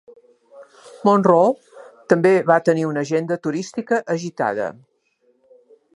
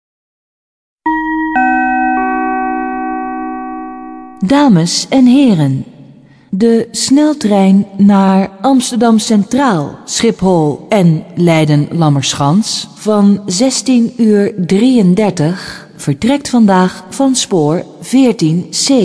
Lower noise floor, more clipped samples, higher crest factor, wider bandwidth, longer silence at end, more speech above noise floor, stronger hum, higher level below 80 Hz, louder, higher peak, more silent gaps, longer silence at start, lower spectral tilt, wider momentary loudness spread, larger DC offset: first, -63 dBFS vs -40 dBFS; neither; first, 20 dB vs 10 dB; about the same, 11.5 kHz vs 11 kHz; first, 1.25 s vs 0 s; first, 45 dB vs 30 dB; neither; second, -72 dBFS vs -46 dBFS; second, -19 LUFS vs -11 LUFS; about the same, -2 dBFS vs 0 dBFS; neither; second, 0.55 s vs 1.05 s; about the same, -6.5 dB/octave vs -5.5 dB/octave; about the same, 11 LU vs 11 LU; neither